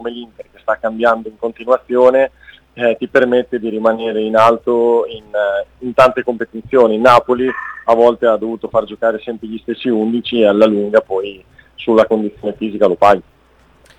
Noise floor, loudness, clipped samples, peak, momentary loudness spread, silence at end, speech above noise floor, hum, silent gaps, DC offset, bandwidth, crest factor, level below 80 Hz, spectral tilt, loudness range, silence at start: -50 dBFS; -14 LUFS; 0.1%; 0 dBFS; 11 LU; 0.75 s; 36 dB; none; none; under 0.1%; 11 kHz; 14 dB; -50 dBFS; -6 dB/octave; 3 LU; 0 s